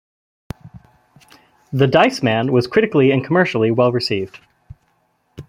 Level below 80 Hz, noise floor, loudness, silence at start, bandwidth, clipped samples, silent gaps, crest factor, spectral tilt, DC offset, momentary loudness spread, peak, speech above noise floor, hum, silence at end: -52 dBFS; -63 dBFS; -16 LUFS; 0.65 s; 15.5 kHz; under 0.1%; none; 18 dB; -6.5 dB/octave; under 0.1%; 21 LU; -2 dBFS; 48 dB; none; 0.05 s